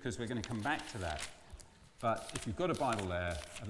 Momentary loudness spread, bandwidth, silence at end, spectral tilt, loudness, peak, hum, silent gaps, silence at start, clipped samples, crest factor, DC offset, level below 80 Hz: 11 LU; 12 kHz; 0 s; -5 dB/octave; -38 LUFS; -20 dBFS; none; none; 0 s; under 0.1%; 20 dB; under 0.1%; -56 dBFS